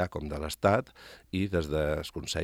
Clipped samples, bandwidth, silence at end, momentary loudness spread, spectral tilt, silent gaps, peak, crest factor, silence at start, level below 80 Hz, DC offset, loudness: under 0.1%; 16.5 kHz; 0 s; 10 LU; -5.5 dB/octave; none; -10 dBFS; 22 dB; 0 s; -46 dBFS; under 0.1%; -31 LUFS